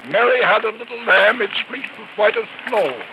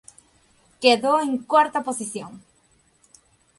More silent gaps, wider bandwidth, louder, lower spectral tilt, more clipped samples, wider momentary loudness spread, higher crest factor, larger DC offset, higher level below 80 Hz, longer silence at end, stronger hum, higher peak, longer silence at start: neither; about the same, 12.5 kHz vs 11.5 kHz; first, -17 LUFS vs -21 LUFS; about the same, -4 dB/octave vs -3 dB/octave; neither; about the same, 13 LU vs 15 LU; second, 16 dB vs 22 dB; neither; second, -84 dBFS vs -68 dBFS; second, 0 s vs 1.2 s; neither; about the same, -4 dBFS vs -2 dBFS; second, 0 s vs 0.8 s